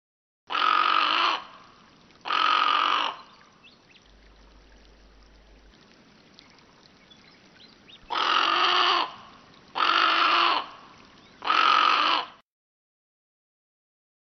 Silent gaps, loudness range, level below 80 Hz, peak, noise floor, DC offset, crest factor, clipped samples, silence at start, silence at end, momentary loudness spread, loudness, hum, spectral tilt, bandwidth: none; 7 LU; -64 dBFS; -6 dBFS; -55 dBFS; under 0.1%; 22 dB; under 0.1%; 0.5 s; 2 s; 13 LU; -22 LUFS; none; 3 dB/octave; 6.4 kHz